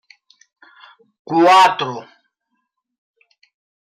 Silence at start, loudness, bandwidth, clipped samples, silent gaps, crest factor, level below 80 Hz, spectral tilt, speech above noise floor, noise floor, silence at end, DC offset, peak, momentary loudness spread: 1.3 s; -13 LUFS; 16 kHz; under 0.1%; none; 16 dB; -76 dBFS; -4 dB/octave; 59 dB; -73 dBFS; 1.8 s; under 0.1%; -4 dBFS; 17 LU